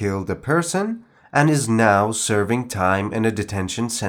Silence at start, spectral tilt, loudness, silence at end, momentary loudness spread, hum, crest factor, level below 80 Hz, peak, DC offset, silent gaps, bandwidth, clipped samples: 0 s; -5 dB/octave; -20 LUFS; 0 s; 9 LU; none; 18 dB; -56 dBFS; -2 dBFS; under 0.1%; none; 19.5 kHz; under 0.1%